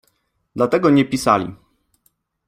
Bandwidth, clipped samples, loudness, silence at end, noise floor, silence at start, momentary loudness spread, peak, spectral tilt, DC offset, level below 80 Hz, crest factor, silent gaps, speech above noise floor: 15.5 kHz; under 0.1%; -17 LUFS; 0.95 s; -67 dBFS; 0.55 s; 15 LU; -2 dBFS; -6 dB/octave; under 0.1%; -54 dBFS; 18 dB; none; 50 dB